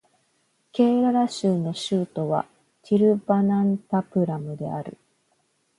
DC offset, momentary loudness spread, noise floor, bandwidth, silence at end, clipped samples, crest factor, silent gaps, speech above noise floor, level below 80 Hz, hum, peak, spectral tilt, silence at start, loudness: under 0.1%; 12 LU; -69 dBFS; 11 kHz; 0.85 s; under 0.1%; 18 dB; none; 46 dB; -68 dBFS; none; -6 dBFS; -7.5 dB/octave; 0.75 s; -23 LUFS